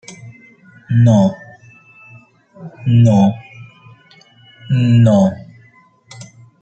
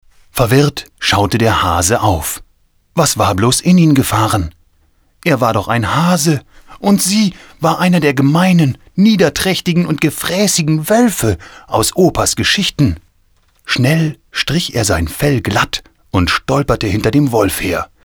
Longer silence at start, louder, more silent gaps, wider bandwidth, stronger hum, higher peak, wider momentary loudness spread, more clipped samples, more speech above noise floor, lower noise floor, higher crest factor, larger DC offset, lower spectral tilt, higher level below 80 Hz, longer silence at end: second, 0.1 s vs 0.35 s; about the same, -13 LUFS vs -13 LUFS; neither; second, 8.2 kHz vs over 20 kHz; neither; about the same, -2 dBFS vs 0 dBFS; first, 26 LU vs 8 LU; neither; second, 38 dB vs 42 dB; second, -49 dBFS vs -54 dBFS; about the same, 14 dB vs 14 dB; neither; first, -8.5 dB/octave vs -4.5 dB/octave; second, -52 dBFS vs -34 dBFS; first, 0.35 s vs 0.2 s